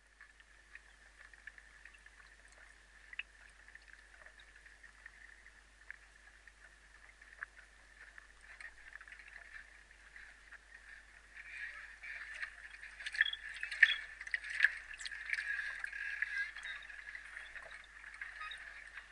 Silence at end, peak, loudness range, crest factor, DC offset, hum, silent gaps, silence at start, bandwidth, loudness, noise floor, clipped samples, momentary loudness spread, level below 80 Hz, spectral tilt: 0 s; -8 dBFS; 21 LU; 36 dB; under 0.1%; none; none; 0.1 s; 11.5 kHz; -39 LUFS; -63 dBFS; under 0.1%; 25 LU; -68 dBFS; 0.5 dB/octave